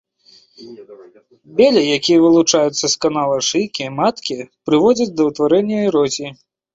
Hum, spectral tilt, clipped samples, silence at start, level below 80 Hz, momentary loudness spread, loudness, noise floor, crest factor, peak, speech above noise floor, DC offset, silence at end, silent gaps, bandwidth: none; -4 dB/octave; under 0.1%; 0.6 s; -58 dBFS; 12 LU; -15 LUFS; -51 dBFS; 16 dB; -2 dBFS; 35 dB; under 0.1%; 0.4 s; none; 8 kHz